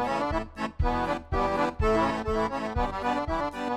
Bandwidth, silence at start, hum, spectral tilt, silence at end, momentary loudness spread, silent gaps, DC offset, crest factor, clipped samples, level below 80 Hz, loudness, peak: 13 kHz; 0 s; none; -6.5 dB/octave; 0 s; 5 LU; none; under 0.1%; 14 dB; under 0.1%; -36 dBFS; -28 LUFS; -12 dBFS